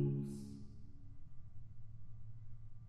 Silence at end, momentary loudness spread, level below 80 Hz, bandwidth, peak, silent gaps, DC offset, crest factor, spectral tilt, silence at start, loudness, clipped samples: 0 s; 16 LU; -56 dBFS; 11 kHz; -28 dBFS; none; under 0.1%; 16 dB; -9.5 dB/octave; 0 s; -51 LUFS; under 0.1%